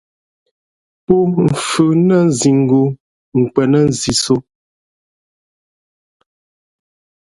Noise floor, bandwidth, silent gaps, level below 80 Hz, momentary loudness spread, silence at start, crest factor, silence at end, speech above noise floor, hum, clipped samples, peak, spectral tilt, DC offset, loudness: under -90 dBFS; 11.5 kHz; 3.00-3.32 s; -48 dBFS; 7 LU; 1.1 s; 16 dB; 2.9 s; over 77 dB; none; under 0.1%; 0 dBFS; -5.5 dB/octave; under 0.1%; -14 LUFS